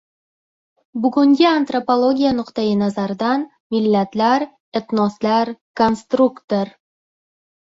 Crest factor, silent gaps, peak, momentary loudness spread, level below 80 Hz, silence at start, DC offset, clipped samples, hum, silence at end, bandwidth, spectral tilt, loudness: 16 dB; 3.60-3.70 s, 4.60-4.72 s, 5.61-5.74 s, 6.44-6.48 s; -2 dBFS; 8 LU; -58 dBFS; 0.95 s; under 0.1%; under 0.1%; none; 1.1 s; 7.8 kHz; -6.5 dB/octave; -18 LUFS